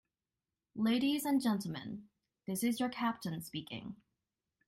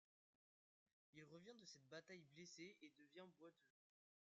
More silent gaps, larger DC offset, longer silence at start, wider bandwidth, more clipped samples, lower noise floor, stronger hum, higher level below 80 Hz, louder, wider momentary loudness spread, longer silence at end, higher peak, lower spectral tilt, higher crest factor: neither; neither; second, 0.75 s vs 1.15 s; first, 16 kHz vs 7.4 kHz; neither; about the same, under -90 dBFS vs under -90 dBFS; neither; first, -74 dBFS vs under -90 dBFS; first, -36 LUFS vs -63 LUFS; first, 18 LU vs 7 LU; about the same, 0.75 s vs 0.7 s; first, -22 dBFS vs -46 dBFS; about the same, -4.5 dB/octave vs -3.5 dB/octave; about the same, 16 dB vs 20 dB